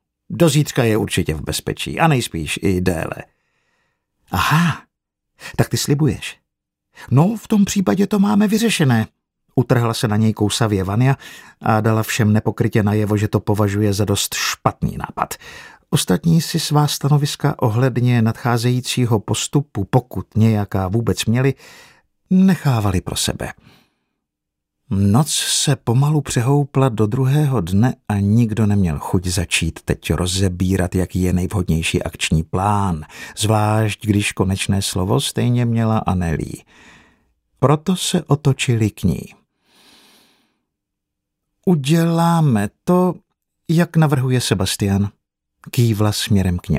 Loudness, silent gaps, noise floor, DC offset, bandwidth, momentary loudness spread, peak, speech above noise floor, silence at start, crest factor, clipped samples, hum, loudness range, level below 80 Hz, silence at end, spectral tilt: -18 LUFS; none; -80 dBFS; under 0.1%; 16 kHz; 8 LU; 0 dBFS; 63 dB; 0.3 s; 18 dB; under 0.1%; none; 4 LU; -40 dBFS; 0 s; -5.5 dB/octave